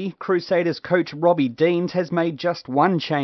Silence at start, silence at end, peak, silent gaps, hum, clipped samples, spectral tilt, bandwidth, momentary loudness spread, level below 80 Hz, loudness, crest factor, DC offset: 0 s; 0 s; -4 dBFS; none; none; under 0.1%; -7.5 dB/octave; 6.2 kHz; 4 LU; -68 dBFS; -21 LUFS; 16 dB; under 0.1%